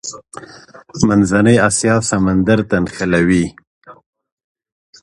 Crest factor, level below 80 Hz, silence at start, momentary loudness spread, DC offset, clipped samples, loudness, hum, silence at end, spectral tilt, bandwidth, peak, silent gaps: 16 dB; -40 dBFS; 0.05 s; 21 LU; under 0.1%; under 0.1%; -14 LUFS; none; 1.1 s; -5.5 dB/octave; 11.5 kHz; 0 dBFS; 3.67-3.81 s